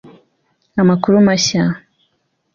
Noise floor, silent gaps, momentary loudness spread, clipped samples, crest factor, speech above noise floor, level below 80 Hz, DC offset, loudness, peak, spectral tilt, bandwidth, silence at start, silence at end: -66 dBFS; none; 12 LU; under 0.1%; 16 dB; 53 dB; -52 dBFS; under 0.1%; -14 LUFS; 0 dBFS; -5 dB/octave; 7.6 kHz; 0.75 s; 0.75 s